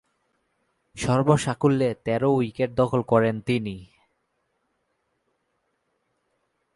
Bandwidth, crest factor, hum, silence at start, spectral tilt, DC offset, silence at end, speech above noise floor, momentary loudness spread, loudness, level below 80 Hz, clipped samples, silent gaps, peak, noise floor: 11.5 kHz; 20 dB; none; 0.95 s; -6.5 dB/octave; under 0.1%; 2.9 s; 52 dB; 7 LU; -23 LUFS; -54 dBFS; under 0.1%; none; -6 dBFS; -74 dBFS